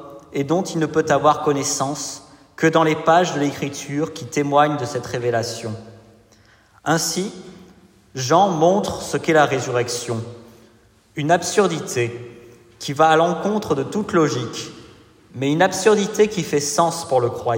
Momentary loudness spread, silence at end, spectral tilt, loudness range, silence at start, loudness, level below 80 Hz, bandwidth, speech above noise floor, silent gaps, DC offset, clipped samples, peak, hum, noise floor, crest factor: 14 LU; 0 s; -4.5 dB/octave; 4 LU; 0 s; -20 LUFS; -58 dBFS; 16.5 kHz; 34 dB; none; under 0.1%; under 0.1%; -2 dBFS; none; -53 dBFS; 18 dB